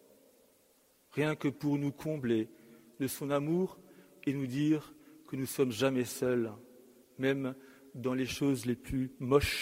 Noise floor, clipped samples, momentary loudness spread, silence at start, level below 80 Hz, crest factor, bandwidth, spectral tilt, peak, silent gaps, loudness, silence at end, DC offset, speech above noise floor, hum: -68 dBFS; under 0.1%; 10 LU; 1.15 s; -56 dBFS; 22 dB; 16 kHz; -5.5 dB/octave; -12 dBFS; none; -34 LUFS; 0 s; under 0.1%; 35 dB; none